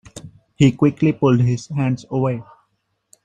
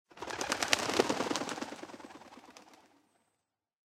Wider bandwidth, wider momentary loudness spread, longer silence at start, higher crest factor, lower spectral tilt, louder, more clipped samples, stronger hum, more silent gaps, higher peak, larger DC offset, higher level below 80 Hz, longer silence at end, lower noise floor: second, 9.2 kHz vs 16 kHz; second, 13 LU vs 23 LU; about the same, 0.15 s vs 0.15 s; second, 18 dB vs 30 dB; first, -7.5 dB/octave vs -2 dB/octave; first, -18 LUFS vs -33 LUFS; neither; neither; neither; first, -2 dBFS vs -6 dBFS; neither; first, -52 dBFS vs -70 dBFS; second, 0.85 s vs 1.15 s; second, -69 dBFS vs -85 dBFS